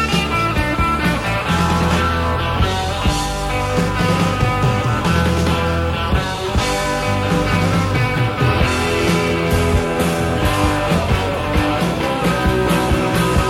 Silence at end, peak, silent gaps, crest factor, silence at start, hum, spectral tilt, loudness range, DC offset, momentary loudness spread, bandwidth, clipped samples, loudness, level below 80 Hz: 0 s; -2 dBFS; none; 14 dB; 0 s; none; -5.5 dB/octave; 1 LU; under 0.1%; 3 LU; 16 kHz; under 0.1%; -17 LUFS; -26 dBFS